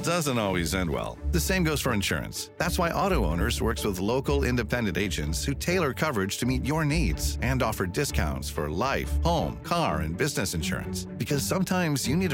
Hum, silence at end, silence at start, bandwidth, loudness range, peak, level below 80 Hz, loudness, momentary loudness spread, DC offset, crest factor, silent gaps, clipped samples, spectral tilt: none; 0 s; 0 s; 17.5 kHz; 1 LU; -10 dBFS; -36 dBFS; -27 LUFS; 4 LU; under 0.1%; 16 dB; none; under 0.1%; -5 dB/octave